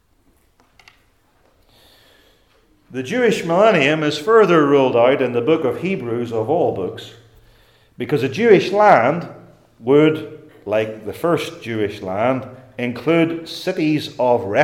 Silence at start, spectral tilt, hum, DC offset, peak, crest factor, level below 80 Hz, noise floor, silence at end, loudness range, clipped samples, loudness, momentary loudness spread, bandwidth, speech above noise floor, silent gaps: 2.9 s; -6 dB/octave; none; under 0.1%; 0 dBFS; 18 dB; -60 dBFS; -58 dBFS; 0 s; 6 LU; under 0.1%; -17 LUFS; 14 LU; 15.5 kHz; 42 dB; none